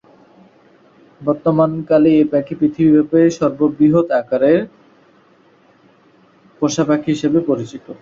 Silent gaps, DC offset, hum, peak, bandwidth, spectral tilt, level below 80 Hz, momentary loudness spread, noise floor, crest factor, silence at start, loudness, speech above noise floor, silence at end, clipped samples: none; under 0.1%; none; -2 dBFS; 7.6 kHz; -7 dB/octave; -56 dBFS; 9 LU; -51 dBFS; 14 dB; 1.2 s; -15 LUFS; 37 dB; 0.05 s; under 0.1%